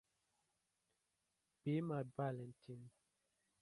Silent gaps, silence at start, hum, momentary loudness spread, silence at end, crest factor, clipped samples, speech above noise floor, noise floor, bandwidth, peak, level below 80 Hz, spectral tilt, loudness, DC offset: none; 1.65 s; none; 16 LU; 0.7 s; 20 dB; under 0.1%; 43 dB; -88 dBFS; 11.5 kHz; -30 dBFS; -84 dBFS; -9 dB/octave; -45 LUFS; under 0.1%